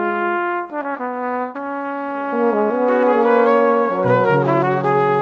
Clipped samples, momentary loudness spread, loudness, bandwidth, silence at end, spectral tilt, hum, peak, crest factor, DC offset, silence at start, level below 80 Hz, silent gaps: under 0.1%; 10 LU; -18 LUFS; 6.4 kHz; 0 s; -9 dB/octave; none; -2 dBFS; 16 dB; under 0.1%; 0 s; -60 dBFS; none